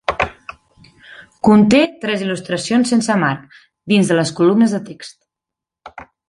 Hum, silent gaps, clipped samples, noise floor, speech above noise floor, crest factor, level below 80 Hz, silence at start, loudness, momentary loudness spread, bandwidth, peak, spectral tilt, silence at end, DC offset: none; none; under 0.1%; -85 dBFS; 70 dB; 16 dB; -48 dBFS; 0.1 s; -15 LUFS; 23 LU; 11.5 kHz; -2 dBFS; -5.5 dB/octave; 0.25 s; under 0.1%